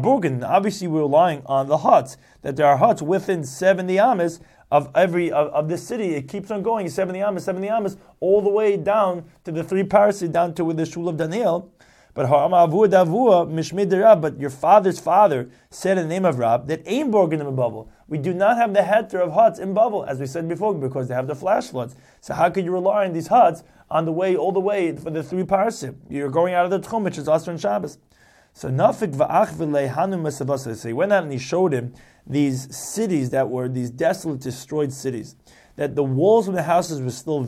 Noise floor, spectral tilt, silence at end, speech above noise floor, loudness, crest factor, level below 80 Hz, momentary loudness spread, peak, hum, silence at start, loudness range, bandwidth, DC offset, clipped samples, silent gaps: -55 dBFS; -6.5 dB/octave; 0 s; 35 dB; -20 LUFS; 18 dB; -60 dBFS; 11 LU; -2 dBFS; none; 0 s; 5 LU; 14.5 kHz; under 0.1%; under 0.1%; none